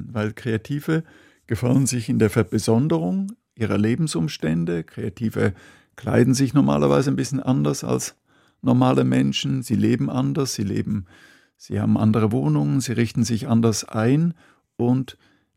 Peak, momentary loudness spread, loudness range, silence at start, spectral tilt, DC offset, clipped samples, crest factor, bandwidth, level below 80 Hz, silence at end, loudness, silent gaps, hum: -2 dBFS; 9 LU; 2 LU; 0 s; -6 dB/octave; under 0.1%; under 0.1%; 18 dB; 16 kHz; -54 dBFS; 0.45 s; -22 LUFS; none; none